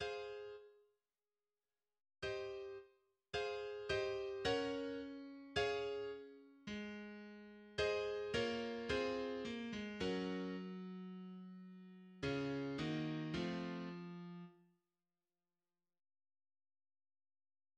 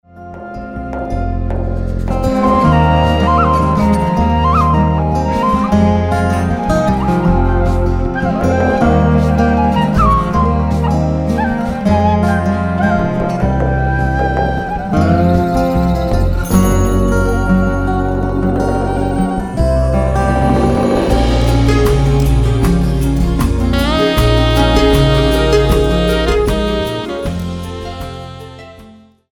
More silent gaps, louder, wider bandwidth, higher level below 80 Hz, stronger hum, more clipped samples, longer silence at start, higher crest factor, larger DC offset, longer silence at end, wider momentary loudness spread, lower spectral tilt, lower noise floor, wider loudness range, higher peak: neither; second, -44 LUFS vs -14 LUFS; second, 10 kHz vs 18 kHz; second, -68 dBFS vs -20 dBFS; neither; neither; second, 0 s vs 0.15 s; first, 20 dB vs 12 dB; neither; first, 3.2 s vs 0.4 s; first, 15 LU vs 8 LU; second, -5.5 dB/octave vs -7 dB/octave; first, under -90 dBFS vs -41 dBFS; first, 8 LU vs 3 LU; second, -26 dBFS vs 0 dBFS